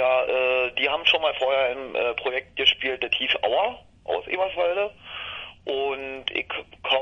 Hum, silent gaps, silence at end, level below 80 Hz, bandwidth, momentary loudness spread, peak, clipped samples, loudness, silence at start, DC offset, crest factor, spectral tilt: none; none; 0 s; -58 dBFS; 7.2 kHz; 12 LU; -4 dBFS; under 0.1%; -24 LUFS; 0 s; under 0.1%; 20 dB; -3 dB/octave